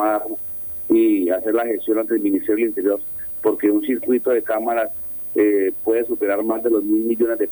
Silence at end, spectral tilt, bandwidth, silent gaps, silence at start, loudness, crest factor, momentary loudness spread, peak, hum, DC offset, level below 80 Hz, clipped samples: 0 s; -7 dB/octave; over 20 kHz; none; 0 s; -19 LUFS; 14 dB; 6 LU; -6 dBFS; none; under 0.1%; -58 dBFS; under 0.1%